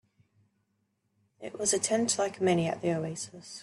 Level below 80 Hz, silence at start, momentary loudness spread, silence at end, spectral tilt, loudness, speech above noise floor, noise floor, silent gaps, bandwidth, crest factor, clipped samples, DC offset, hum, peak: -72 dBFS; 1.4 s; 14 LU; 0 s; -4 dB/octave; -29 LUFS; 47 dB; -77 dBFS; none; 12.5 kHz; 20 dB; under 0.1%; under 0.1%; none; -12 dBFS